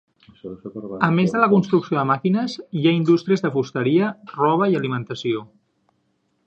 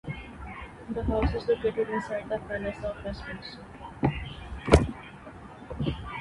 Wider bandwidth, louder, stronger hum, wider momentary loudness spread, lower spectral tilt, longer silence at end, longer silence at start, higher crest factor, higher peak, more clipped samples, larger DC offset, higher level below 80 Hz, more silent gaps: second, 8 kHz vs 11.5 kHz; first, -20 LUFS vs -30 LUFS; neither; second, 15 LU vs 20 LU; about the same, -7.5 dB/octave vs -7 dB/octave; first, 1 s vs 0 s; first, 0.45 s vs 0.05 s; second, 20 dB vs 28 dB; about the same, 0 dBFS vs -2 dBFS; neither; neither; second, -64 dBFS vs -38 dBFS; neither